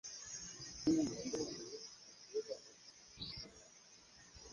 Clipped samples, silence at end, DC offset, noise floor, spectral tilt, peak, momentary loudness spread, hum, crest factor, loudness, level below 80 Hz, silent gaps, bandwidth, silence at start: under 0.1%; 0 s; under 0.1%; -63 dBFS; -4 dB/octave; -24 dBFS; 22 LU; none; 20 dB; -43 LUFS; -68 dBFS; none; 10.5 kHz; 0.05 s